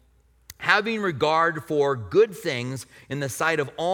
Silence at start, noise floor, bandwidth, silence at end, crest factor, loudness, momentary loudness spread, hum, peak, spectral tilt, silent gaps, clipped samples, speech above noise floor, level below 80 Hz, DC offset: 0.5 s; -55 dBFS; 18 kHz; 0 s; 20 dB; -24 LUFS; 10 LU; none; -4 dBFS; -4.5 dB/octave; none; under 0.1%; 32 dB; -60 dBFS; under 0.1%